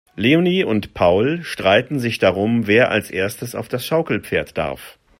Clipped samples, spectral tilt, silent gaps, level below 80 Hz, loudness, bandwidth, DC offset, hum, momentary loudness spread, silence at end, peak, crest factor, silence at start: under 0.1%; -5.5 dB/octave; none; -50 dBFS; -18 LUFS; 16.5 kHz; under 0.1%; none; 10 LU; 0.3 s; -2 dBFS; 18 dB; 0.15 s